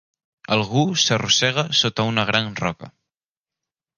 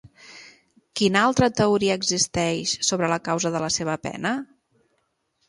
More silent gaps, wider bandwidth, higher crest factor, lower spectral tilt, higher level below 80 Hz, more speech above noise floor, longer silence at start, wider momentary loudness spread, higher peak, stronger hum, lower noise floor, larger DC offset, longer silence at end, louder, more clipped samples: neither; about the same, 11 kHz vs 11.5 kHz; about the same, 20 dB vs 20 dB; about the same, -3.5 dB/octave vs -3.5 dB/octave; about the same, -56 dBFS vs -54 dBFS; first, over 70 dB vs 49 dB; first, 0.5 s vs 0.05 s; about the same, 9 LU vs 9 LU; about the same, -2 dBFS vs -4 dBFS; neither; first, under -90 dBFS vs -72 dBFS; neither; about the same, 1.1 s vs 1.05 s; first, -19 LUFS vs -22 LUFS; neither